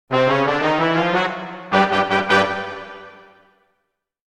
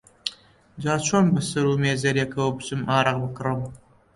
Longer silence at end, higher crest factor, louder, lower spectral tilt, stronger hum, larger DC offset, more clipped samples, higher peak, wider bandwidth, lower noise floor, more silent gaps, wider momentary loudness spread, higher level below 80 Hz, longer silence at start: first, 1.2 s vs 0.4 s; about the same, 18 dB vs 20 dB; first, -18 LUFS vs -24 LUFS; about the same, -5.5 dB/octave vs -5 dB/octave; neither; neither; neither; about the same, -2 dBFS vs -4 dBFS; about the same, 12 kHz vs 11.5 kHz; first, -74 dBFS vs -49 dBFS; neither; first, 15 LU vs 12 LU; about the same, -54 dBFS vs -54 dBFS; second, 0.1 s vs 0.25 s